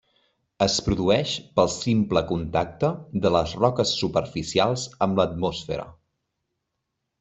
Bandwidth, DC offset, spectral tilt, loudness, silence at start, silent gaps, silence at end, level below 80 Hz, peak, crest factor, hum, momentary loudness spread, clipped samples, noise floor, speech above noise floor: 8.2 kHz; under 0.1%; -5 dB/octave; -24 LUFS; 0.6 s; none; 1.3 s; -48 dBFS; -4 dBFS; 22 dB; none; 5 LU; under 0.1%; -80 dBFS; 57 dB